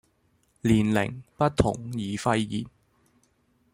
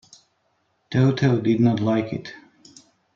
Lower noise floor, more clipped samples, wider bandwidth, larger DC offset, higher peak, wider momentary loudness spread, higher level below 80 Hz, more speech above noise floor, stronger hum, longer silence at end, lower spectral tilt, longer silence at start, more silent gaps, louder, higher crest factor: about the same, -68 dBFS vs -69 dBFS; neither; first, 16 kHz vs 7.6 kHz; neither; about the same, -8 dBFS vs -6 dBFS; second, 10 LU vs 13 LU; first, -48 dBFS vs -58 dBFS; second, 42 dB vs 49 dB; neither; first, 1.05 s vs 0.8 s; second, -6.5 dB/octave vs -8 dB/octave; second, 0.65 s vs 0.9 s; neither; second, -26 LUFS vs -21 LUFS; about the same, 20 dB vs 16 dB